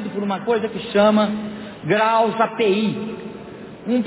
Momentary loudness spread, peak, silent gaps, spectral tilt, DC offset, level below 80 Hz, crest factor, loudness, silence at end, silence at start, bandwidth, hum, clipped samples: 17 LU; -6 dBFS; none; -10 dB/octave; under 0.1%; -58 dBFS; 14 dB; -19 LUFS; 0 s; 0 s; 4 kHz; none; under 0.1%